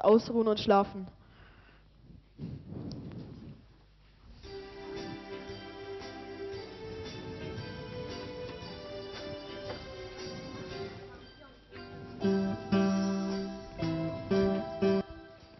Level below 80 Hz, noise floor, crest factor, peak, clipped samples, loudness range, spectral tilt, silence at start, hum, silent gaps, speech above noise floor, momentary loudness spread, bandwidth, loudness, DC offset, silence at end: -56 dBFS; -60 dBFS; 22 dB; -12 dBFS; under 0.1%; 14 LU; -5.5 dB/octave; 0 s; none; none; 33 dB; 19 LU; 6.2 kHz; -34 LUFS; under 0.1%; 0 s